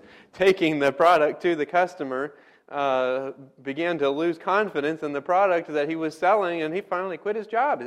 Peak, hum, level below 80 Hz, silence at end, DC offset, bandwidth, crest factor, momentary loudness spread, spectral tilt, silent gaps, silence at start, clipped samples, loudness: -8 dBFS; none; -68 dBFS; 0 s; under 0.1%; 15 kHz; 16 dB; 10 LU; -5.5 dB/octave; none; 0.35 s; under 0.1%; -24 LUFS